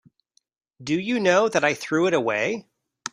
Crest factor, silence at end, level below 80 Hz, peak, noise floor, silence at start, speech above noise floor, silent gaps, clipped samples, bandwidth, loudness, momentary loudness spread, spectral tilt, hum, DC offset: 20 dB; 0.05 s; -68 dBFS; -4 dBFS; -67 dBFS; 0.8 s; 45 dB; none; under 0.1%; 15.5 kHz; -22 LUFS; 14 LU; -4.5 dB/octave; none; under 0.1%